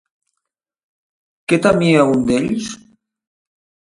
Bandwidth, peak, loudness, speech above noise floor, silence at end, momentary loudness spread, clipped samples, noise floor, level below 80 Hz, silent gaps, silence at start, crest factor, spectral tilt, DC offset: 11.5 kHz; 0 dBFS; -15 LUFS; 65 dB; 1.1 s; 18 LU; under 0.1%; -80 dBFS; -50 dBFS; none; 1.5 s; 20 dB; -6 dB/octave; under 0.1%